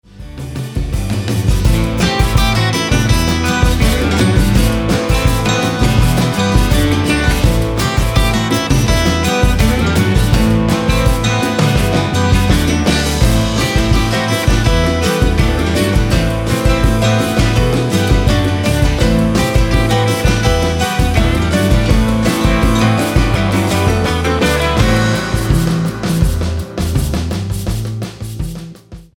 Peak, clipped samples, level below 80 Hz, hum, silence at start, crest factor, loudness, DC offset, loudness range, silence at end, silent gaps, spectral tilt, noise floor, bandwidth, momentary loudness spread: 0 dBFS; under 0.1%; -18 dBFS; none; 0.15 s; 12 dB; -14 LUFS; under 0.1%; 2 LU; 0.15 s; none; -5.5 dB/octave; -34 dBFS; 17.5 kHz; 6 LU